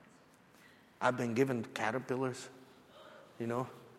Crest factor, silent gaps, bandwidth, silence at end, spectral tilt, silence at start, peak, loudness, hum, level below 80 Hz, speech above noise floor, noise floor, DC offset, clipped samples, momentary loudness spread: 22 dB; none; 15 kHz; 0 s; -6 dB/octave; 0.65 s; -16 dBFS; -36 LUFS; none; -78 dBFS; 28 dB; -63 dBFS; under 0.1%; under 0.1%; 23 LU